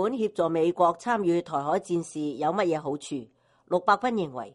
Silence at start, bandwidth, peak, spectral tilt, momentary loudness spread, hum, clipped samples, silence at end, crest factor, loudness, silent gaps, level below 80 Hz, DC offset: 0 s; 11.5 kHz; -8 dBFS; -6 dB/octave; 9 LU; none; under 0.1%; 0.05 s; 20 dB; -27 LUFS; none; -68 dBFS; under 0.1%